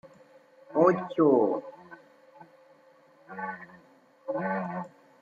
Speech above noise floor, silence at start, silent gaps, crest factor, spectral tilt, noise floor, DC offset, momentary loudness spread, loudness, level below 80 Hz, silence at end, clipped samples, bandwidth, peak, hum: 33 dB; 0.05 s; none; 22 dB; -9 dB/octave; -59 dBFS; under 0.1%; 22 LU; -28 LUFS; -78 dBFS; 0.35 s; under 0.1%; 7.2 kHz; -10 dBFS; none